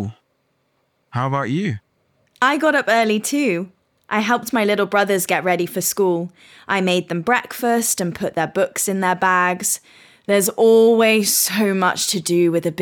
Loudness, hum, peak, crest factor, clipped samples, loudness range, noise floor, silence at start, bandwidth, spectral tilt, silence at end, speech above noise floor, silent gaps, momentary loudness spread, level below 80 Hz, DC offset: -18 LUFS; none; -4 dBFS; 16 dB; under 0.1%; 4 LU; -67 dBFS; 0 s; 19 kHz; -3.5 dB/octave; 0 s; 49 dB; none; 9 LU; -64 dBFS; under 0.1%